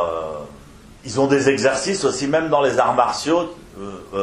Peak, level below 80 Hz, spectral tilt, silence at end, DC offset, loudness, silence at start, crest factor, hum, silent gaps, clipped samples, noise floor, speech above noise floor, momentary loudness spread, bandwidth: -2 dBFS; -50 dBFS; -4 dB/octave; 0 s; under 0.1%; -19 LUFS; 0 s; 18 dB; none; none; under 0.1%; -43 dBFS; 24 dB; 18 LU; 12.5 kHz